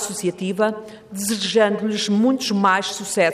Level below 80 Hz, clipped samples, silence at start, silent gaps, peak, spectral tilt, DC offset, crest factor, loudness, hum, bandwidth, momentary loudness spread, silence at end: -64 dBFS; under 0.1%; 0 s; none; -6 dBFS; -4 dB/octave; under 0.1%; 16 dB; -20 LUFS; none; 15.5 kHz; 7 LU; 0 s